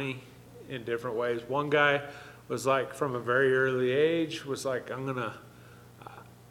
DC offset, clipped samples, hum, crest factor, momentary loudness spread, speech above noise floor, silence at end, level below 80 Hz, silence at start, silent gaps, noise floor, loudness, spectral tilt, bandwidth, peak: under 0.1%; under 0.1%; 60 Hz at -55 dBFS; 20 dB; 21 LU; 23 dB; 0.2 s; -68 dBFS; 0 s; none; -52 dBFS; -29 LUFS; -5 dB/octave; 16.5 kHz; -10 dBFS